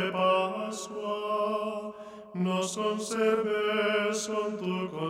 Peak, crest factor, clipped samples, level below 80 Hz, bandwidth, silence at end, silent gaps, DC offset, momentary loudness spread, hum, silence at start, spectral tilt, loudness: -12 dBFS; 16 dB; under 0.1%; -72 dBFS; 14.5 kHz; 0 s; none; under 0.1%; 9 LU; none; 0 s; -4.5 dB/octave; -29 LUFS